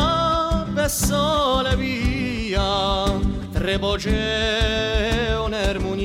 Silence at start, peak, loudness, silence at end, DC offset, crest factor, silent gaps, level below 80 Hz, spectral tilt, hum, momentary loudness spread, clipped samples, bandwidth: 0 s; -10 dBFS; -21 LUFS; 0 s; under 0.1%; 12 dB; none; -28 dBFS; -4.5 dB/octave; none; 4 LU; under 0.1%; 16 kHz